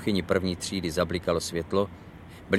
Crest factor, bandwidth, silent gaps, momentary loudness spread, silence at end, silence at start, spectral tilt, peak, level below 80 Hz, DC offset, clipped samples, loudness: 20 dB; 15.5 kHz; none; 19 LU; 0 s; 0 s; -5 dB/octave; -8 dBFS; -50 dBFS; under 0.1%; under 0.1%; -28 LUFS